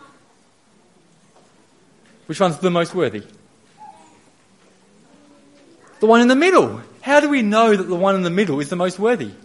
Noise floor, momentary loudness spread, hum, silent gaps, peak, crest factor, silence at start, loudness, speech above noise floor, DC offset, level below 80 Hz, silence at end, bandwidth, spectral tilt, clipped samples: -56 dBFS; 10 LU; none; none; 0 dBFS; 20 dB; 2.3 s; -17 LUFS; 40 dB; under 0.1%; -68 dBFS; 0.1 s; 11.5 kHz; -5.5 dB/octave; under 0.1%